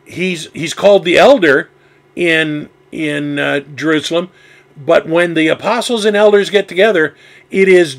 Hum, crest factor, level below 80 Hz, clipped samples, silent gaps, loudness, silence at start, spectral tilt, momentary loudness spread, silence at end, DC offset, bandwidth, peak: none; 12 dB; -56 dBFS; 0.1%; none; -12 LUFS; 0.1 s; -4.5 dB/octave; 13 LU; 0 s; under 0.1%; 15.5 kHz; 0 dBFS